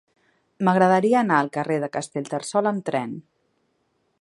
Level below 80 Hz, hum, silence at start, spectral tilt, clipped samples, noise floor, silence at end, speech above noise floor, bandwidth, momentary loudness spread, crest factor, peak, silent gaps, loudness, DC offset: -72 dBFS; none; 0.6 s; -6 dB/octave; under 0.1%; -70 dBFS; 1 s; 49 dB; 11.5 kHz; 11 LU; 20 dB; -4 dBFS; none; -22 LUFS; under 0.1%